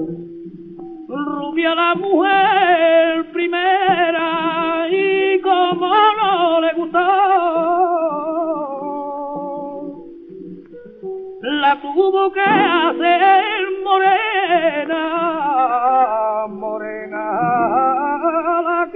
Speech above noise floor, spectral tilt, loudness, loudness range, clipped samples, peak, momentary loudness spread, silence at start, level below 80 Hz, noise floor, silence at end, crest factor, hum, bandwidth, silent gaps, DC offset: 22 dB; -1.5 dB/octave; -16 LUFS; 7 LU; under 0.1%; -2 dBFS; 16 LU; 0 s; -62 dBFS; -37 dBFS; 0 s; 16 dB; none; 4.5 kHz; none; under 0.1%